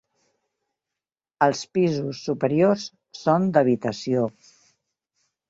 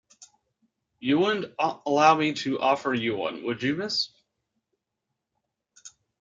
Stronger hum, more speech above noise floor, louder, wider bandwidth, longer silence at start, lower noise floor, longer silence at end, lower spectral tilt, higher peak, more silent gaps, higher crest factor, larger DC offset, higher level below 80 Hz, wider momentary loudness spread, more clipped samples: neither; first, 67 dB vs 59 dB; about the same, -23 LUFS vs -25 LUFS; about the same, 7.8 kHz vs 7.8 kHz; first, 1.4 s vs 0.2 s; first, -89 dBFS vs -83 dBFS; first, 1.2 s vs 0.3 s; first, -6.5 dB/octave vs -4.5 dB/octave; about the same, -4 dBFS vs -6 dBFS; neither; about the same, 20 dB vs 22 dB; neither; about the same, -66 dBFS vs -70 dBFS; about the same, 8 LU vs 10 LU; neither